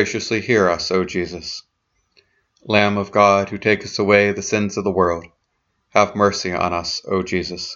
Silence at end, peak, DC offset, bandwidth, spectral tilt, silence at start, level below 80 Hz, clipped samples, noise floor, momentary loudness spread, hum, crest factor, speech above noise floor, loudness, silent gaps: 0 s; 0 dBFS; under 0.1%; 7.8 kHz; -4.5 dB/octave; 0 s; -50 dBFS; under 0.1%; -70 dBFS; 9 LU; none; 20 dB; 52 dB; -18 LUFS; none